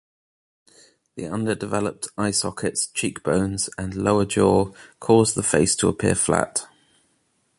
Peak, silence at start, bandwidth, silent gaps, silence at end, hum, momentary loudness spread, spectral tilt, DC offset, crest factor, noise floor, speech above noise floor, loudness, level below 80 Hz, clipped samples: -4 dBFS; 1.15 s; 11.5 kHz; none; 0.95 s; none; 10 LU; -4.5 dB/octave; under 0.1%; 20 dB; -67 dBFS; 46 dB; -22 LUFS; -48 dBFS; under 0.1%